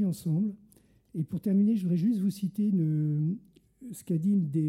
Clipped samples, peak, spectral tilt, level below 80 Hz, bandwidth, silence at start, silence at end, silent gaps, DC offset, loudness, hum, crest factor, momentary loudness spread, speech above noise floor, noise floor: under 0.1%; -18 dBFS; -9 dB/octave; -68 dBFS; 15 kHz; 0 s; 0 s; none; under 0.1%; -29 LUFS; none; 10 dB; 14 LU; 34 dB; -61 dBFS